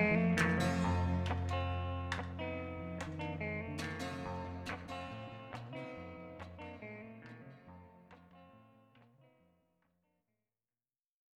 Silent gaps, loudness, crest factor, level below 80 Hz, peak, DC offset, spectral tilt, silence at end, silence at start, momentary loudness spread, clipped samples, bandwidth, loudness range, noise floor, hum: none; -39 LUFS; 22 dB; -56 dBFS; -18 dBFS; under 0.1%; -6.5 dB/octave; 2.35 s; 0 s; 21 LU; under 0.1%; 13 kHz; 19 LU; under -90 dBFS; none